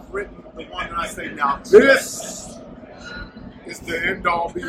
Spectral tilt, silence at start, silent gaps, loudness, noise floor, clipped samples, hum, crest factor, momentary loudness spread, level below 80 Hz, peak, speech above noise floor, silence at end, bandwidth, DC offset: -3.5 dB/octave; 0 s; none; -19 LUFS; -39 dBFS; under 0.1%; none; 20 dB; 25 LU; -46 dBFS; 0 dBFS; 20 dB; 0 s; 16 kHz; under 0.1%